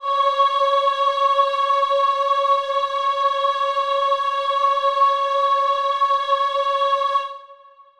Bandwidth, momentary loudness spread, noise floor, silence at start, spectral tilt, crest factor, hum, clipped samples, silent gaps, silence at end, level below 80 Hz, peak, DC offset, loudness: 10 kHz; 3 LU; -47 dBFS; 0 s; 1 dB/octave; 14 dB; none; under 0.1%; none; 0.45 s; -66 dBFS; -6 dBFS; under 0.1%; -19 LUFS